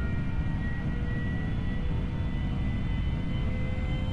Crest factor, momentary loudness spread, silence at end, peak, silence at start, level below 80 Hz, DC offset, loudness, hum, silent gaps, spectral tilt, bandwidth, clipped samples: 8 dB; 1 LU; 0 s; -20 dBFS; 0 s; -32 dBFS; under 0.1%; -32 LUFS; none; none; -8.5 dB/octave; 7.8 kHz; under 0.1%